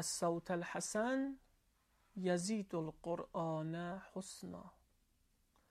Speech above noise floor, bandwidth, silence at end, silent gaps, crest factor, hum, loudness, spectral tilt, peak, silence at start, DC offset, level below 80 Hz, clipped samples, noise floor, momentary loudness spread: 36 dB; 15 kHz; 1 s; none; 18 dB; none; -41 LUFS; -4.5 dB/octave; -24 dBFS; 0 s; under 0.1%; -74 dBFS; under 0.1%; -77 dBFS; 13 LU